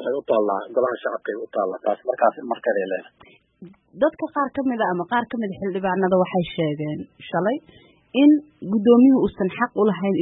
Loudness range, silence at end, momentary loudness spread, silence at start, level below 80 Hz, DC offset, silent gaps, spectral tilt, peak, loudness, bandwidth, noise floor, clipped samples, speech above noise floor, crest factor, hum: 5 LU; 0 s; 11 LU; 0 s; -58 dBFS; under 0.1%; none; -11.5 dB/octave; -4 dBFS; -22 LUFS; 4 kHz; -46 dBFS; under 0.1%; 25 dB; 18 dB; none